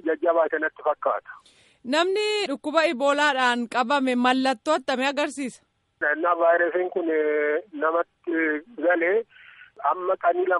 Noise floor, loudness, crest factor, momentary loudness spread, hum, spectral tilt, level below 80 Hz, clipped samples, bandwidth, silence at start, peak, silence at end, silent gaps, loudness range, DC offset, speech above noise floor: -47 dBFS; -23 LUFS; 18 dB; 7 LU; none; -2.5 dB/octave; -76 dBFS; under 0.1%; 11.5 kHz; 0.05 s; -6 dBFS; 0 s; none; 2 LU; under 0.1%; 24 dB